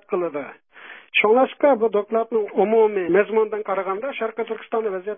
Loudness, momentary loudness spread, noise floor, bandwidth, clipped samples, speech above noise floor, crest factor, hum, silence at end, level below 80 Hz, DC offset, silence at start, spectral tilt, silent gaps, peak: -21 LUFS; 11 LU; -44 dBFS; 3.7 kHz; under 0.1%; 23 dB; 18 dB; none; 0 s; -74 dBFS; under 0.1%; 0.1 s; -10 dB/octave; none; -4 dBFS